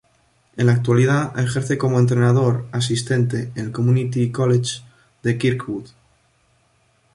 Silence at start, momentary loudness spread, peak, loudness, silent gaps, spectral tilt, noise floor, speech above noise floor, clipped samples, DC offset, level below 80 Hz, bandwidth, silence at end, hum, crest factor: 0.55 s; 11 LU; -4 dBFS; -19 LUFS; none; -6.5 dB/octave; -61 dBFS; 43 dB; under 0.1%; under 0.1%; -54 dBFS; 11.5 kHz; 1.3 s; none; 16 dB